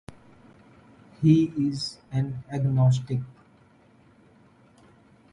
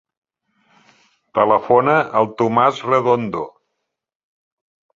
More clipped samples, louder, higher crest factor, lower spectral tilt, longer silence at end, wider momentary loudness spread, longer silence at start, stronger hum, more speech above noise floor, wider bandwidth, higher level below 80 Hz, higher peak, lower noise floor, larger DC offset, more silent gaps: neither; second, -25 LUFS vs -17 LUFS; about the same, 20 dB vs 18 dB; about the same, -8 dB/octave vs -7 dB/octave; first, 2 s vs 1.45 s; about the same, 12 LU vs 11 LU; second, 1.2 s vs 1.35 s; neither; second, 34 dB vs 61 dB; first, 11 kHz vs 7.6 kHz; about the same, -58 dBFS vs -60 dBFS; second, -8 dBFS vs 0 dBFS; second, -57 dBFS vs -77 dBFS; neither; neither